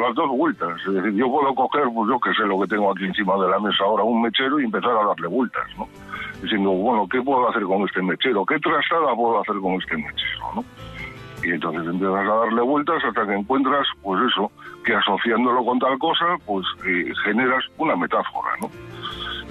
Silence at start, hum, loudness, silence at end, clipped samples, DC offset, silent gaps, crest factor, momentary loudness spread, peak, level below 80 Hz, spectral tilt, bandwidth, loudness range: 0 s; none; -21 LUFS; 0 s; under 0.1%; under 0.1%; none; 12 dB; 9 LU; -8 dBFS; -54 dBFS; -6.5 dB/octave; 12.5 kHz; 3 LU